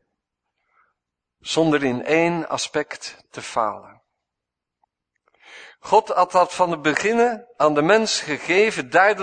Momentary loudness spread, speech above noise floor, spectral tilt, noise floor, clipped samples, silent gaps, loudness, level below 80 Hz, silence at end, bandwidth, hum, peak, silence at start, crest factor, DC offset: 14 LU; 64 dB; -4 dB/octave; -84 dBFS; under 0.1%; none; -20 LUFS; -66 dBFS; 0 s; 9.6 kHz; none; -2 dBFS; 1.45 s; 20 dB; under 0.1%